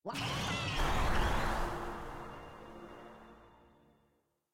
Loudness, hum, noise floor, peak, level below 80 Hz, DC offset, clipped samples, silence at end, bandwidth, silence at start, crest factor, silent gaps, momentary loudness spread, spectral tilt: -36 LUFS; none; -76 dBFS; -20 dBFS; -42 dBFS; under 0.1%; under 0.1%; 1.05 s; 16.5 kHz; 0.05 s; 16 dB; none; 19 LU; -4.5 dB/octave